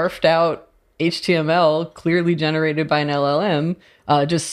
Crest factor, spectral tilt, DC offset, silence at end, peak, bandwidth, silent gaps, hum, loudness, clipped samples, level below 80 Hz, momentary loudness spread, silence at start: 16 dB; -5.5 dB/octave; under 0.1%; 0 s; -2 dBFS; 13 kHz; none; none; -19 LUFS; under 0.1%; -58 dBFS; 6 LU; 0 s